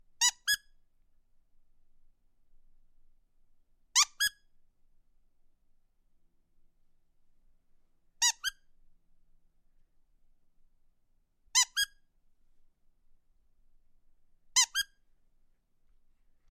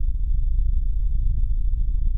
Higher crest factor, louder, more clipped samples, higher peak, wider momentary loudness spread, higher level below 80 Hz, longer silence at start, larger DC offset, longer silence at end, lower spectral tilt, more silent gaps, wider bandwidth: first, 28 dB vs 8 dB; about the same, -29 LUFS vs -27 LUFS; neither; about the same, -12 dBFS vs -10 dBFS; first, 9 LU vs 1 LU; second, -66 dBFS vs -20 dBFS; first, 0.2 s vs 0 s; neither; first, 1.7 s vs 0 s; second, 5.5 dB/octave vs -11 dB/octave; neither; first, 15.5 kHz vs 0.5 kHz